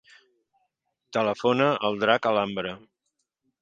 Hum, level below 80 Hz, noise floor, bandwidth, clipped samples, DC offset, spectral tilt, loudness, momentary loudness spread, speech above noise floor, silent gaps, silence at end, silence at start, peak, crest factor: none; -68 dBFS; -79 dBFS; 7.8 kHz; under 0.1%; under 0.1%; -5.5 dB/octave; -25 LUFS; 11 LU; 55 dB; none; 0.85 s; 1.1 s; -4 dBFS; 24 dB